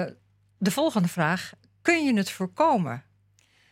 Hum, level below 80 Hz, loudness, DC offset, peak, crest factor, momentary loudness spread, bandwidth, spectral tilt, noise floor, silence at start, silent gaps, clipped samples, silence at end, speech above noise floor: 50 Hz at -55 dBFS; -72 dBFS; -25 LUFS; under 0.1%; -8 dBFS; 20 dB; 11 LU; 16.5 kHz; -5.5 dB/octave; -63 dBFS; 0 s; none; under 0.1%; 0.7 s; 39 dB